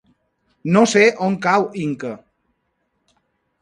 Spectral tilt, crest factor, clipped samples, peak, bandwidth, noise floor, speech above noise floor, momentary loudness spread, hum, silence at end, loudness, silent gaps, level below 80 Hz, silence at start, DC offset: -5 dB/octave; 20 dB; under 0.1%; 0 dBFS; 11 kHz; -70 dBFS; 54 dB; 18 LU; none; 1.45 s; -17 LUFS; none; -64 dBFS; 0.65 s; under 0.1%